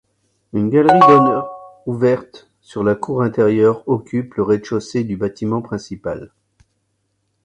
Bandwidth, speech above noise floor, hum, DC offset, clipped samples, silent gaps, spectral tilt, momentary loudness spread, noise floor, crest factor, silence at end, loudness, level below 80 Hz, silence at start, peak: 9.4 kHz; 52 dB; none; under 0.1%; under 0.1%; none; -7.5 dB/octave; 17 LU; -68 dBFS; 18 dB; 1.2 s; -17 LUFS; -52 dBFS; 0.55 s; 0 dBFS